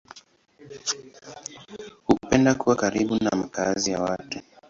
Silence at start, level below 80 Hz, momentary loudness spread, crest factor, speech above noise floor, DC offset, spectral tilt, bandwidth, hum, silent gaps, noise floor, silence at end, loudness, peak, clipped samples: 0.15 s; -52 dBFS; 19 LU; 22 dB; 28 dB; under 0.1%; -4.5 dB/octave; 7.8 kHz; none; none; -54 dBFS; 0.3 s; -24 LUFS; -4 dBFS; under 0.1%